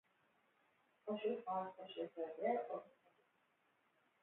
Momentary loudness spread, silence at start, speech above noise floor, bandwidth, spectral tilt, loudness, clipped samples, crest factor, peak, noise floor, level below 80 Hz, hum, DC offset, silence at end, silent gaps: 9 LU; 1.05 s; 36 dB; 4 kHz; -4 dB/octave; -45 LUFS; under 0.1%; 20 dB; -28 dBFS; -80 dBFS; under -90 dBFS; none; under 0.1%; 1.3 s; none